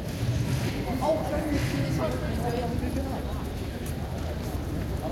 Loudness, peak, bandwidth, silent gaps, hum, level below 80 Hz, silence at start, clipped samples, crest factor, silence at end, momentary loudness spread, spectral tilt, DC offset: -30 LUFS; -14 dBFS; 16.5 kHz; none; none; -38 dBFS; 0 s; under 0.1%; 16 dB; 0 s; 6 LU; -6.5 dB/octave; under 0.1%